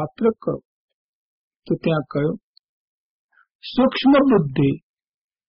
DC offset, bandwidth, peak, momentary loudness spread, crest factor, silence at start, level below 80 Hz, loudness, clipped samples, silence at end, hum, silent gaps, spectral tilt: under 0.1%; 5.4 kHz; -6 dBFS; 16 LU; 16 dB; 0 s; -52 dBFS; -20 LUFS; under 0.1%; 0.7 s; none; 0.65-0.88 s, 0.94-1.60 s, 2.43-3.29 s, 3.55-3.59 s; -6 dB/octave